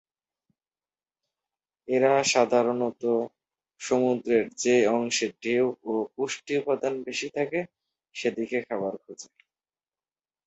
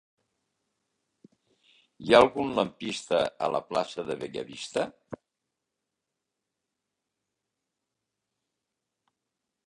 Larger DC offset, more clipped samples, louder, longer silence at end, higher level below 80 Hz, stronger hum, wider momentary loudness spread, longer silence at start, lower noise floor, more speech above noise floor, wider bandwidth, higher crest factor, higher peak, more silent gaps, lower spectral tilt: neither; neither; about the same, -26 LUFS vs -27 LUFS; second, 1.2 s vs 4.5 s; second, -72 dBFS vs -66 dBFS; neither; second, 12 LU vs 19 LU; about the same, 1.9 s vs 2 s; first, under -90 dBFS vs -85 dBFS; first, over 64 dB vs 58 dB; second, 8.2 kHz vs 11.5 kHz; second, 20 dB vs 26 dB; second, -8 dBFS vs -4 dBFS; neither; about the same, -3.5 dB/octave vs -4.5 dB/octave